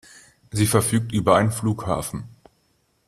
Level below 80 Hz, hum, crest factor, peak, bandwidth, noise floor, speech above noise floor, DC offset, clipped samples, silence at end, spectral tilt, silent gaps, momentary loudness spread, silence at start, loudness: -50 dBFS; none; 20 dB; -2 dBFS; 15 kHz; -66 dBFS; 45 dB; under 0.1%; under 0.1%; 0.8 s; -5.5 dB/octave; none; 13 LU; 0.55 s; -22 LUFS